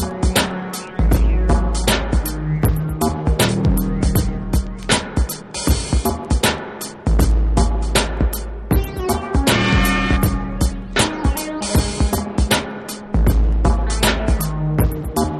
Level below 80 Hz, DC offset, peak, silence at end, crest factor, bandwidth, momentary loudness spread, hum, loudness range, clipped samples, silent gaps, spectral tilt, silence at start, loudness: -20 dBFS; under 0.1%; 0 dBFS; 0 s; 16 dB; 14 kHz; 6 LU; none; 1 LU; under 0.1%; none; -5 dB/octave; 0 s; -19 LUFS